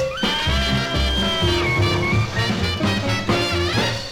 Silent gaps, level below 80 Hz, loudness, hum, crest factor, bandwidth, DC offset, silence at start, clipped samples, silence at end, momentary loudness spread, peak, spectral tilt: none; -30 dBFS; -20 LUFS; none; 14 dB; 16.5 kHz; under 0.1%; 0 s; under 0.1%; 0 s; 2 LU; -6 dBFS; -4.5 dB/octave